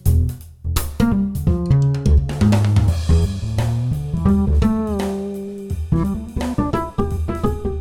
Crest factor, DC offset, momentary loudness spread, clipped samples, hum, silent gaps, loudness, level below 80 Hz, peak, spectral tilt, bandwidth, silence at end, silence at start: 16 dB; under 0.1%; 8 LU; under 0.1%; none; none; -19 LUFS; -24 dBFS; -2 dBFS; -7.5 dB/octave; 17 kHz; 0 s; 0.05 s